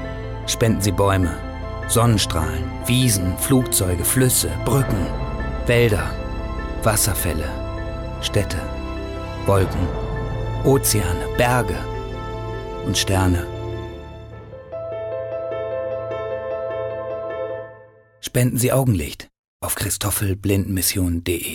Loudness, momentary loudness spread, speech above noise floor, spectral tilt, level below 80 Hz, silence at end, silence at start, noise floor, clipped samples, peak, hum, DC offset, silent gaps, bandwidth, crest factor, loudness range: -21 LUFS; 13 LU; 28 dB; -4.5 dB/octave; -32 dBFS; 0 s; 0 s; -47 dBFS; under 0.1%; -6 dBFS; none; under 0.1%; 19.39-19.60 s; 18 kHz; 16 dB; 8 LU